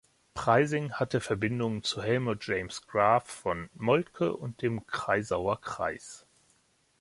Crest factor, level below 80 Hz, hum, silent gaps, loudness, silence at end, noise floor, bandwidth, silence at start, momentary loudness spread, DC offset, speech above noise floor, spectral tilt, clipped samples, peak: 22 dB; -58 dBFS; none; none; -30 LUFS; 0.8 s; -69 dBFS; 11.5 kHz; 0.35 s; 9 LU; under 0.1%; 39 dB; -5.5 dB/octave; under 0.1%; -8 dBFS